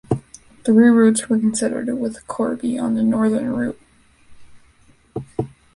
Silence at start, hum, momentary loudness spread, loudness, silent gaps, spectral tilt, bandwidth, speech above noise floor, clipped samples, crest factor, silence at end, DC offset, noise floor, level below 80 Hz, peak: 0.1 s; none; 16 LU; -19 LUFS; none; -6 dB/octave; 11.5 kHz; 36 dB; under 0.1%; 16 dB; 0.3 s; under 0.1%; -53 dBFS; -52 dBFS; -2 dBFS